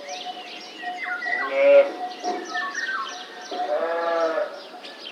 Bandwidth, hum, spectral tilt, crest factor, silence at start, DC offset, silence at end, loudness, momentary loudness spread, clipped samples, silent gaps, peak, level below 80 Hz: 9.6 kHz; none; -1.5 dB/octave; 20 dB; 0 s; under 0.1%; 0 s; -24 LUFS; 19 LU; under 0.1%; none; -6 dBFS; under -90 dBFS